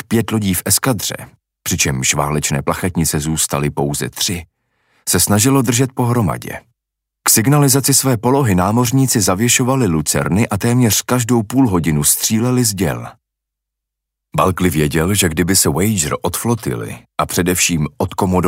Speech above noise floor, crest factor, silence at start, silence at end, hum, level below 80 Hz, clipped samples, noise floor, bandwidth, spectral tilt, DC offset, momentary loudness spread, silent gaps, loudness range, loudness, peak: 65 dB; 16 dB; 0.1 s; 0 s; none; -40 dBFS; under 0.1%; -80 dBFS; 16.5 kHz; -4 dB/octave; under 0.1%; 8 LU; none; 4 LU; -15 LUFS; 0 dBFS